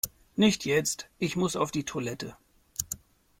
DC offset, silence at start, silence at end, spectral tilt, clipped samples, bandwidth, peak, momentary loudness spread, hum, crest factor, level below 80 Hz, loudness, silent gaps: under 0.1%; 0.05 s; 0.45 s; -4 dB/octave; under 0.1%; 16.5 kHz; -8 dBFS; 13 LU; none; 22 dB; -60 dBFS; -29 LUFS; none